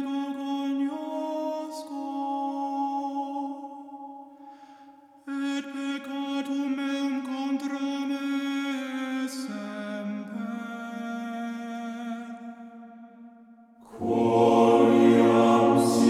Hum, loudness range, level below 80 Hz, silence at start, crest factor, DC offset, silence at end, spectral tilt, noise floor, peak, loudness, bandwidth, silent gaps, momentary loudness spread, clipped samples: none; 12 LU; -72 dBFS; 0 s; 20 dB; under 0.1%; 0 s; -5.5 dB/octave; -52 dBFS; -8 dBFS; -27 LUFS; 14.5 kHz; none; 21 LU; under 0.1%